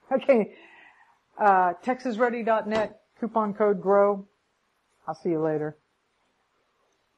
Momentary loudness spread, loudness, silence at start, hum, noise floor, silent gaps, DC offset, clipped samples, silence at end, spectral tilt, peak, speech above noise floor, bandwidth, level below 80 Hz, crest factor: 13 LU; -25 LUFS; 0.1 s; none; -72 dBFS; none; under 0.1%; under 0.1%; 1.45 s; -7.5 dB/octave; -8 dBFS; 48 dB; 8.8 kHz; -70 dBFS; 18 dB